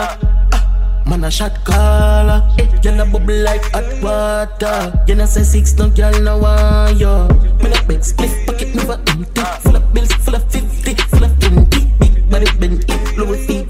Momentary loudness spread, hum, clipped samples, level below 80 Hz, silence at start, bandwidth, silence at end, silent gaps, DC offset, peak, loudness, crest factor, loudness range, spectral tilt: 6 LU; none; under 0.1%; -12 dBFS; 0 s; 15.5 kHz; 0 s; none; under 0.1%; 0 dBFS; -14 LUFS; 10 dB; 3 LU; -5.5 dB/octave